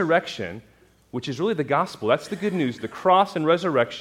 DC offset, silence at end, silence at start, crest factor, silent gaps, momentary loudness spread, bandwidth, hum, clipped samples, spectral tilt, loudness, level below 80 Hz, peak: under 0.1%; 0 s; 0 s; 18 dB; none; 14 LU; 15 kHz; none; under 0.1%; -6 dB/octave; -23 LUFS; -64 dBFS; -6 dBFS